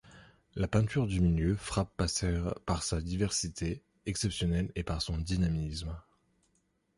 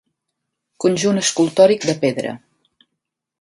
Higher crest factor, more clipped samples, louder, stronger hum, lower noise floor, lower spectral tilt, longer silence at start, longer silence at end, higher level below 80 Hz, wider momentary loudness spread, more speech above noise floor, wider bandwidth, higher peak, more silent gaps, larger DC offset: about the same, 18 dB vs 20 dB; neither; second, -33 LUFS vs -17 LUFS; neither; second, -75 dBFS vs -79 dBFS; about the same, -5 dB/octave vs -4 dB/octave; second, 0.05 s vs 0.8 s; about the same, 0.95 s vs 1.05 s; first, -42 dBFS vs -64 dBFS; second, 9 LU vs 13 LU; second, 43 dB vs 63 dB; about the same, 11.5 kHz vs 11.5 kHz; second, -14 dBFS vs 0 dBFS; neither; neither